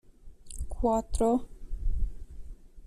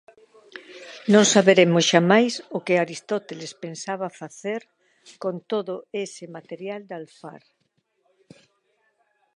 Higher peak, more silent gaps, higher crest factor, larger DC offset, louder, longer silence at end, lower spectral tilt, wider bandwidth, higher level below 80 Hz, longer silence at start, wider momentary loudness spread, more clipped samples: second, -14 dBFS vs 0 dBFS; neither; second, 16 dB vs 24 dB; neither; second, -31 LUFS vs -21 LUFS; second, 0 s vs 2 s; first, -7 dB/octave vs -4 dB/octave; first, 13.5 kHz vs 11 kHz; first, -36 dBFS vs -76 dBFS; second, 0.25 s vs 0.55 s; second, 22 LU vs 25 LU; neither